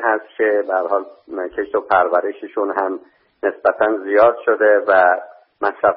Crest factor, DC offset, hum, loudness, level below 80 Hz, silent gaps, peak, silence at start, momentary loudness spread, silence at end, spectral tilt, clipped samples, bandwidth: 16 dB; under 0.1%; none; -17 LUFS; -60 dBFS; none; -2 dBFS; 0 s; 11 LU; 0 s; -2 dB/octave; under 0.1%; 5.2 kHz